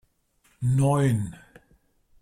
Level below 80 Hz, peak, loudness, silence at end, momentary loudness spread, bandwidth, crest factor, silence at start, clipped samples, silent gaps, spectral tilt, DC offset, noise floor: -54 dBFS; -12 dBFS; -24 LUFS; 0.9 s; 10 LU; 13.5 kHz; 16 dB; 0.6 s; under 0.1%; none; -7.5 dB/octave; under 0.1%; -66 dBFS